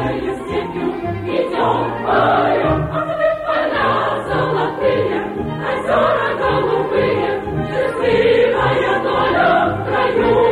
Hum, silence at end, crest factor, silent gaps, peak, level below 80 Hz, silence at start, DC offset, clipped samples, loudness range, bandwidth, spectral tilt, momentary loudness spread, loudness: none; 0 s; 12 dB; none; -4 dBFS; -40 dBFS; 0 s; under 0.1%; under 0.1%; 2 LU; 11.5 kHz; -7 dB/octave; 8 LU; -17 LUFS